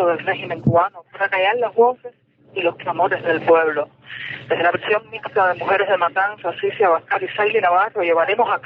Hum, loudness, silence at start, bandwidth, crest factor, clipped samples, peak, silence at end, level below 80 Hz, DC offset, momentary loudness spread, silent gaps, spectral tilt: none; -19 LUFS; 0 s; 5.2 kHz; 14 dB; under 0.1%; -4 dBFS; 0.05 s; -56 dBFS; under 0.1%; 8 LU; none; -8 dB/octave